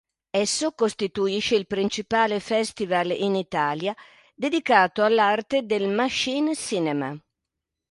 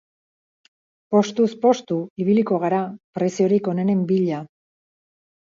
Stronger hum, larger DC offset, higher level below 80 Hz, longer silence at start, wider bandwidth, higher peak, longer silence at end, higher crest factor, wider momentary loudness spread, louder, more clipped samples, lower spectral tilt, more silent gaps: neither; neither; first, -62 dBFS vs -70 dBFS; second, 0.35 s vs 1.1 s; first, 11.5 kHz vs 7.6 kHz; about the same, -4 dBFS vs -4 dBFS; second, 0.7 s vs 1.1 s; about the same, 20 dB vs 18 dB; about the same, 9 LU vs 7 LU; second, -24 LUFS vs -21 LUFS; neither; second, -3.5 dB/octave vs -7 dB/octave; second, none vs 2.10-2.16 s, 3.04-3.13 s